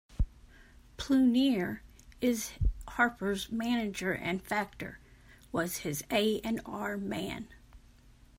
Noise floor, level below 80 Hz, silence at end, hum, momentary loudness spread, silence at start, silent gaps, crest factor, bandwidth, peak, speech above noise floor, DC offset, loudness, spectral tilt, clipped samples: -58 dBFS; -44 dBFS; 0.6 s; none; 13 LU; 0.1 s; none; 20 dB; 16 kHz; -12 dBFS; 27 dB; under 0.1%; -32 LUFS; -4.5 dB/octave; under 0.1%